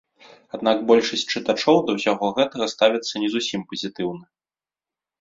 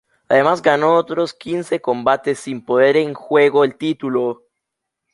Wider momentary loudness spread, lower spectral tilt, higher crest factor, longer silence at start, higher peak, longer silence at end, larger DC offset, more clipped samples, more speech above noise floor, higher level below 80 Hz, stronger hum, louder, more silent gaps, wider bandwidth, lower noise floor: about the same, 11 LU vs 9 LU; second, -4 dB/octave vs -5.5 dB/octave; about the same, 20 dB vs 16 dB; first, 0.55 s vs 0.3 s; about the same, -2 dBFS vs -2 dBFS; first, 0.95 s vs 0.8 s; neither; neither; first, over 69 dB vs 63 dB; about the same, -66 dBFS vs -62 dBFS; neither; second, -21 LUFS vs -17 LUFS; neither; second, 7.8 kHz vs 11.5 kHz; first, under -90 dBFS vs -80 dBFS